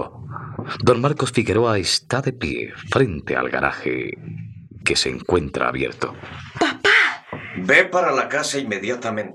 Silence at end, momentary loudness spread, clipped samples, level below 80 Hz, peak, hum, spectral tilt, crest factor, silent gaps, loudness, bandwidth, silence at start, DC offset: 0 s; 17 LU; under 0.1%; -48 dBFS; -2 dBFS; none; -4 dB/octave; 20 dB; none; -20 LUFS; 13 kHz; 0 s; under 0.1%